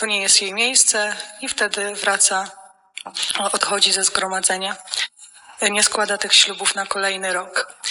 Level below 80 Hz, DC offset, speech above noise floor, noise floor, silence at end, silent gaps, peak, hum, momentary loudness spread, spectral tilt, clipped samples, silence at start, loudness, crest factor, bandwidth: -64 dBFS; under 0.1%; 25 dB; -45 dBFS; 0 s; none; 0 dBFS; none; 11 LU; 1 dB/octave; under 0.1%; 0 s; -18 LUFS; 20 dB; over 20 kHz